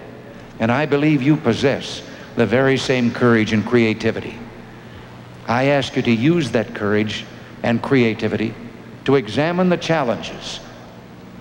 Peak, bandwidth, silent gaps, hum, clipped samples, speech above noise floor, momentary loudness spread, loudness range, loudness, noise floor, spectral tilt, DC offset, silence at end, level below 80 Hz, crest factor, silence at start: -4 dBFS; 16 kHz; none; none; under 0.1%; 21 dB; 22 LU; 3 LU; -18 LUFS; -39 dBFS; -6.5 dB/octave; under 0.1%; 0 s; -50 dBFS; 16 dB; 0 s